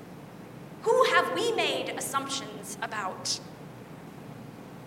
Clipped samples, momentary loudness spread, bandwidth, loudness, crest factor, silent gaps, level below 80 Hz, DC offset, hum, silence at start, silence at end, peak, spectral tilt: under 0.1%; 22 LU; 16 kHz; -28 LUFS; 22 dB; none; -68 dBFS; under 0.1%; none; 0 s; 0 s; -8 dBFS; -2.5 dB/octave